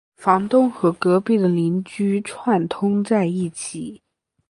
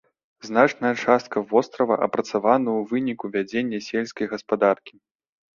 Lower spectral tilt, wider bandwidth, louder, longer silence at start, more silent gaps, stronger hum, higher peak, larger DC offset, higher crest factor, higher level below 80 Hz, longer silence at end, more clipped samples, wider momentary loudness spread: first, -7 dB/octave vs -5.5 dB/octave; first, 11.5 kHz vs 7.4 kHz; first, -20 LUFS vs -23 LUFS; second, 0.2 s vs 0.45 s; neither; neither; about the same, -2 dBFS vs -2 dBFS; neither; about the same, 18 dB vs 22 dB; about the same, -64 dBFS vs -66 dBFS; second, 0.55 s vs 0.7 s; neither; about the same, 10 LU vs 8 LU